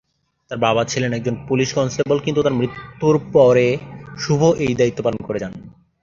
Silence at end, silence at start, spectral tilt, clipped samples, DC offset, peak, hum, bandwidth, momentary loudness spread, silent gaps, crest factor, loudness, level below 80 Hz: 0.35 s; 0.5 s; -6 dB/octave; under 0.1%; under 0.1%; -2 dBFS; none; 7.6 kHz; 13 LU; none; 18 dB; -18 LUFS; -50 dBFS